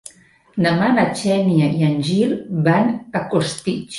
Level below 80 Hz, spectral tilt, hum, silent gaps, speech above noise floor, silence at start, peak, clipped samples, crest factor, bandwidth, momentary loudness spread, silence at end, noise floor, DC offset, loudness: -56 dBFS; -6.5 dB/octave; none; none; 33 dB; 0.55 s; -4 dBFS; under 0.1%; 14 dB; 11.5 kHz; 6 LU; 0 s; -51 dBFS; under 0.1%; -18 LUFS